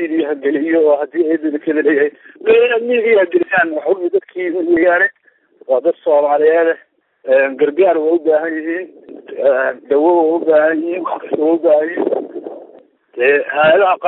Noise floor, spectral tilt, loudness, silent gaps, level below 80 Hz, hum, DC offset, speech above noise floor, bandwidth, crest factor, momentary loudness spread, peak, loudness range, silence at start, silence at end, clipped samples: -48 dBFS; -10 dB/octave; -14 LUFS; none; -64 dBFS; none; under 0.1%; 35 dB; 4.1 kHz; 12 dB; 10 LU; -2 dBFS; 2 LU; 0 s; 0 s; under 0.1%